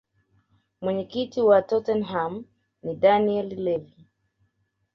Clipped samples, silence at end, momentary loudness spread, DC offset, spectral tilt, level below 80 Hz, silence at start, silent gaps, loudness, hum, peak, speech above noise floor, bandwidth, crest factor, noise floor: under 0.1%; 1.1 s; 13 LU; under 0.1%; -7.5 dB/octave; -64 dBFS; 0.8 s; none; -24 LUFS; none; -6 dBFS; 49 dB; 6.4 kHz; 20 dB; -72 dBFS